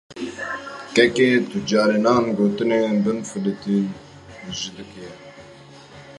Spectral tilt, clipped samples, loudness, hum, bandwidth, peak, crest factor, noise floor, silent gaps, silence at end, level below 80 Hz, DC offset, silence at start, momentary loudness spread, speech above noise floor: -5 dB/octave; under 0.1%; -21 LUFS; none; 11.5 kHz; -2 dBFS; 20 dB; -44 dBFS; none; 0 s; -58 dBFS; under 0.1%; 0.1 s; 21 LU; 24 dB